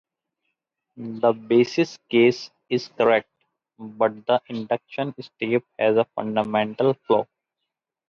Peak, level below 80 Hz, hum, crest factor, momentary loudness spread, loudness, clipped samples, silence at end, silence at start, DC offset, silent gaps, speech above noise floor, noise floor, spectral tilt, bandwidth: -6 dBFS; -70 dBFS; none; 18 dB; 12 LU; -23 LUFS; under 0.1%; 0.85 s; 0.95 s; under 0.1%; none; 61 dB; -83 dBFS; -6 dB/octave; 7 kHz